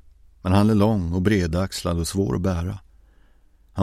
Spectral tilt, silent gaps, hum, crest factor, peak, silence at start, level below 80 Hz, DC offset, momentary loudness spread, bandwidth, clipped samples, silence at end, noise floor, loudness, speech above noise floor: -6.5 dB/octave; none; none; 18 dB; -4 dBFS; 0.45 s; -40 dBFS; under 0.1%; 13 LU; 14.5 kHz; under 0.1%; 0 s; -55 dBFS; -22 LUFS; 34 dB